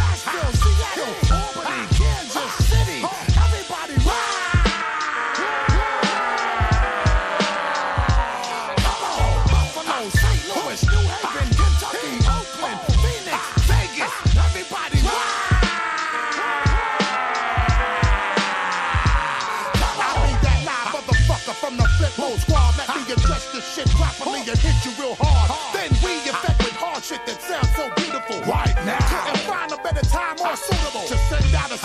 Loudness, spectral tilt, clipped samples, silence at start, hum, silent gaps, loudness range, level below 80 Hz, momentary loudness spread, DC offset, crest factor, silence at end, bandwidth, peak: -21 LUFS; -4.5 dB/octave; under 0.1%; 0 s; none; none; 2 LU; -22 dBFS; 5 LU; under 0.1%; 14 dB; 0 s; 14 kHz; -4 dBFS